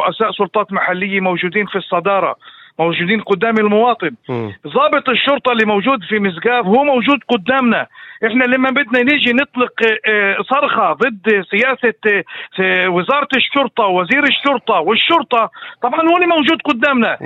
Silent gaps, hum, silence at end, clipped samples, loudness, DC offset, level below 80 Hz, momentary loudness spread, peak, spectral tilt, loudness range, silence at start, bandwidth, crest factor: none; none; 0 s; under 0.1%; -14 LUFS; under 0.1%; -62 dBFS; 6 LU; 0 dBFS; -6.5 dB/octave; 2 LU; 0 s; 7.8 kHz; 14 dB